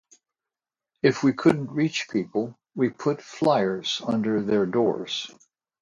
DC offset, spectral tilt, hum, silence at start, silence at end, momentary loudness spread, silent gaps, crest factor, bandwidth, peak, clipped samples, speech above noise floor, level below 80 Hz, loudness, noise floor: under 0.1%; -5.5 dB/octave; none; 1.05 s; 0.55 s; 8 LU; none; 20 dB; 11 kHz; -6 dBFS; under 0.1%; 66 dB; -66 dBFS; -25 LUFS; -90 dBFS